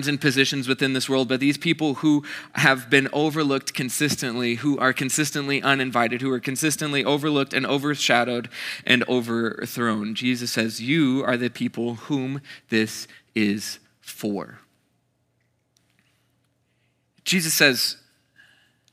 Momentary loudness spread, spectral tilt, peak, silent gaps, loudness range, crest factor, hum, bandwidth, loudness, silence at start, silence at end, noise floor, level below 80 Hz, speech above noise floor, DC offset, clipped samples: 10 LU; -3.5 dB/octave; -2 dBFS; none; 10 LU; 22 dB; none; 16 kHz; -22 LUFS; 0 s; 0.95 s; -69 dBFS; -76 dBFS; 47 dB; under 0.1%; under 0.1%